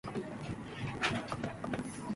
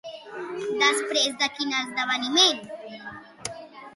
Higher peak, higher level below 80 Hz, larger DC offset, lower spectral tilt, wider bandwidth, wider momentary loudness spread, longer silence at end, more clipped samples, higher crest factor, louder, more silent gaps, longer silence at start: second, -16 dBFS vs -6 dBFS; first, -58 dBFS vs -70 dBFS; neither; first, -5 dB/octave vs -0.5 dB/octave; about the same, 11.5 kHz vs 12 kHz; second, 8 LU vs 20 LU; about the same, 0 s vs 0 s; neither; about the same, 22 dB vs 20 dB; second, -38 LUFS vs -23 LUFS; neither; about the same, 0.05 s vs 0.05 s